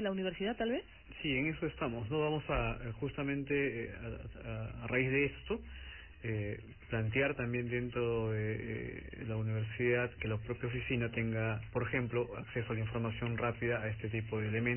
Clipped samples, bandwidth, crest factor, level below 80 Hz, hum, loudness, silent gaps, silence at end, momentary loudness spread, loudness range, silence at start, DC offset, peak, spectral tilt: under 0.1%; 3.2 kHz; 16 dB; -52 dBFS; none; -37 LUFS; none; 0 s; 10 LU; 1 LU; 0 s; under 0.1%; -20 dBFS; -4.5 dB/octave